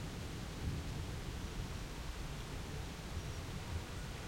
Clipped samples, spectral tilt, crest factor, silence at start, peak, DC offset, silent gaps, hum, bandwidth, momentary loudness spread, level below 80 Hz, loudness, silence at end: under 0.1%; -5 dB/octave; 16 dB; 0 s; -28 dBFS; under 0.1%; none; none; 16 kHz; 3 LU; -48 dBFS; -45 LUFS; 0 s